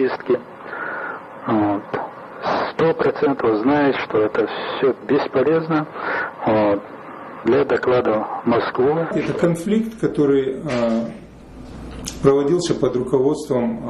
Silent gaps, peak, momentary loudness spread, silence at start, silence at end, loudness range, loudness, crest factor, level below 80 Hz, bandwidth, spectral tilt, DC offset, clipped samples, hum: none; -4 dBFS; 13 LU; 0 s; 0 s; 2 LU; -20 LUFS; 16 dB; -48 dBFS; 12.5 kHz; -6.5 dB/octave; under 0.1%; under 0.1%; none